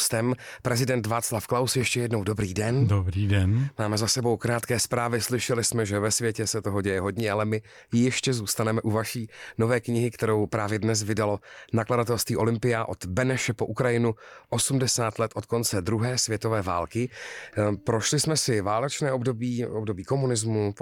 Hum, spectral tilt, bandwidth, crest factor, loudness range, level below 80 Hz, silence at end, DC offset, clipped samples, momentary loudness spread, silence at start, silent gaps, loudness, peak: none; -4.5 dB/octave; 18.5 kHz; 14 dB; 2 LU; -54 dBFS; 0 s; under 0.1%; under 0.1%; 6 LU; 0 s; none; -26 LUFS; -12 dBFS